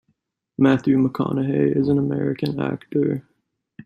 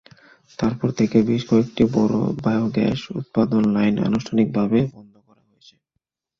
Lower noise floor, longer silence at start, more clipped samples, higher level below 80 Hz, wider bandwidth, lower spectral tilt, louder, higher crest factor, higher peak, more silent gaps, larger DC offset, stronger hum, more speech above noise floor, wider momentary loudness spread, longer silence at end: second, -70 dBFS vs -78 dBFS; about the same, 0.6 s vs 0.6 s; neither; second, -58 dBFS vs -50 dBFS; about the same, 6.8 kHz vs 7 kHz; first, -9 dB/octave vs -7.5 dB/octave; about the same, -21 LUFS vs -20 LUFS; about the same, 16 dB vs 18 dB; about the same, -4 dBFS vs -4 dBFS; neither; neither; neither; second, 51 dB vs 59 dB; about the same, 7 LU vs 7 LU; second, 0.05 s vs 1.4 s